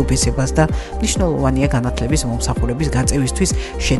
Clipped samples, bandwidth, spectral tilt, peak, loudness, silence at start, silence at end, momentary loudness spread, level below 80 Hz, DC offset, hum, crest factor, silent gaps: under 0.1%; 12 kHz; -5 dB/octave; -2 dBFS; -18 LUFS; 0 s; 0 s; 3 LU; -22 dBFS; under 0.1%; none; 14 dB; none